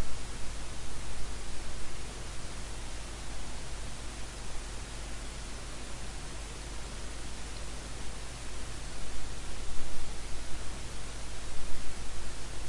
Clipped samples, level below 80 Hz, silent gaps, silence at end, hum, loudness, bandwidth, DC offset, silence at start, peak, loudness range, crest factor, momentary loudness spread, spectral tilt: under 0.1%; -42 dBFS; none; 0 s; none; -42 LUFS; 11.5 kHz; under 0.1%; 0 s; -14 dBFS; 0 LU; 14 dB; 0 LU; -3 dB/octave